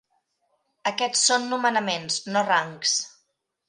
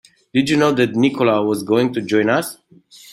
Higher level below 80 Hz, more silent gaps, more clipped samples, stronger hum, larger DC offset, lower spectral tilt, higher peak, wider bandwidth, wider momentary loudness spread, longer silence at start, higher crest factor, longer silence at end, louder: second, -78 dBFS vs -60 dBFS; neither; neither; neither; neither; second, -1 dB/octave vs -5.5 dB/octave; second, -6 dBFS vs -2 dBFS; second, 11.5 kHz vs 16 kHz; first, 8 LU vs 5 LU; first, 0.85 s vs 0.35 s; about the same, 20 dB vs 16 dB; first, 0.6 s vs 0 s; second, -23 LUFS vs -17 LUFS